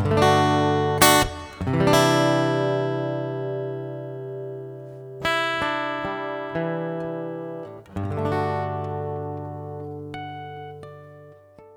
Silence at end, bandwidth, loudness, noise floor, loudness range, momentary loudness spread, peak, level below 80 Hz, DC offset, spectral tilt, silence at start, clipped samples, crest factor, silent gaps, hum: 0 s; over 20 kHz; -23 LUFS; -48 dBFS; 10 LU; 18 LU; 0 dBFS; -48 dBFS; under 0.1%; -4.5 dB/octave; 0 s; under 0.1%; 24 dB; none; none